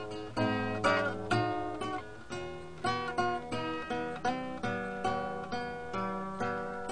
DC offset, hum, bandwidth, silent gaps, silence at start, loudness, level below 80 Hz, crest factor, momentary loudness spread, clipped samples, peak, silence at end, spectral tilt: 0.3%; none; 10.5 kHz; none; 0 s; -34 LUFS; -58 dBFS; 20 dB; 8 LU; under 0.1%; -14 dBFS; 0 s; -5.5 dB/octave